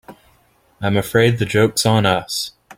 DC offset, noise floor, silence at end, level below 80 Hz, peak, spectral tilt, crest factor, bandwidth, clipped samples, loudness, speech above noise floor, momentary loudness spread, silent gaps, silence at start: under 0.1%; -57 dBFS; 0.05 s; -48 dBFS; -2 dBFS; -5 dB/octave; 18 dB; 16.5 kHz; under 0.1%; -17 LUFS; 40 dB; 9 LU; none; 0.1 s